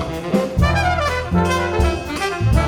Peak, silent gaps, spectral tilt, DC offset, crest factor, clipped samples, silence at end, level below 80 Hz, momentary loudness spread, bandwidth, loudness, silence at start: -4 dBFS; none; -6 dB/octave; under 0.1%; 14 dB; under 0.1%; 0 s; -24 dBFS; 4 LU; 16.5 kHz; -19 LUFS; 0 s